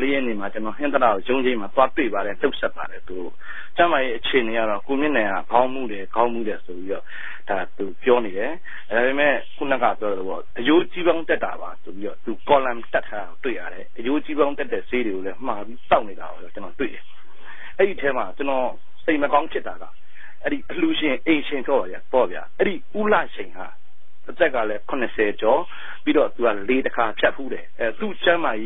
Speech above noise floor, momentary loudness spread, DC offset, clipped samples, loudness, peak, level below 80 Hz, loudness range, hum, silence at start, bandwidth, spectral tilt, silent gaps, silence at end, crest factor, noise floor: 21 dB; 14 LU; 6%; under 0.1%; -23 LUFS; -2 dBFS; -56 dBFS; 3 LU; none; 0 s; 4 kHz; -9.5 dB/octave; none; 0 s; 20 dB; -44 dBFS